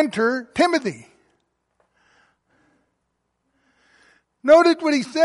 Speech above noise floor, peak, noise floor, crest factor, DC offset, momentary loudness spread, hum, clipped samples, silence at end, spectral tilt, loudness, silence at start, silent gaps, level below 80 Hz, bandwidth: 56 dB; -4 dBFS; -74 dBFS; 18 dB; under 0.1%; 15 LU; none; under 0.1%; 0 s; -4.5 dB/octave; -18 LUFS; 0 s; none; -64 dBFS; 11.5 kHz